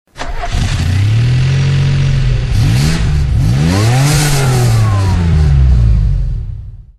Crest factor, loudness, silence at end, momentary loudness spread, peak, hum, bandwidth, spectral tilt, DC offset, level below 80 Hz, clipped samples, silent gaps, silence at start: 10 dB; -12 LUFS; 0.15 s; 9 LU; 0 dBFS; none; 13.5 kHz; -5.5 dB/octave; under 0.1%; -16 dBFS; under 0.1%; none; 0.15 s